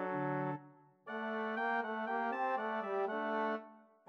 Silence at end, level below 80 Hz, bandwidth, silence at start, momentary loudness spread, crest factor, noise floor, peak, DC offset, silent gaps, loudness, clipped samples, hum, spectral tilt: 0.25 s; under -90 dBFS; 6.6 kHz; 0 s; 9 LU; 14 dB; -60 dBFS; -24 dBFS; under 0.1%; none; -38 LUFS; under 0.1%; none; -7.5 dB/octave